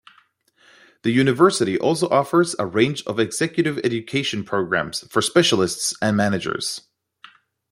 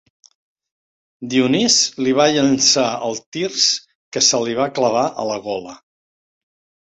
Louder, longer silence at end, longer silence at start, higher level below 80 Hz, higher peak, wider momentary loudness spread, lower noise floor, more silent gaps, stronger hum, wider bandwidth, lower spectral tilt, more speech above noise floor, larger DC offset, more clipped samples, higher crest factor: second, -20 LUFS vs -16 LUFS; second, 0.9 s vs 1.05 s; second, 1.05 s vs 1.2 s; about the same, -60 dBFS vs -62 dBFS; about the same, -2 dBFS vs -2 dBFS; second, 7 LU vs 11 LU; second, -59 dBFS vs under -90 dBFS; second, none vs 3.26-3.32 s, 3.95-4.12 s; neither; first, 16 kHz vs 8.4 kHz; first, -4.5 dB/octave vs -2.5 dB/octave; second, 39 dB vs over 73 dB; neither; neither; about the same, 18 dB vs 18 dB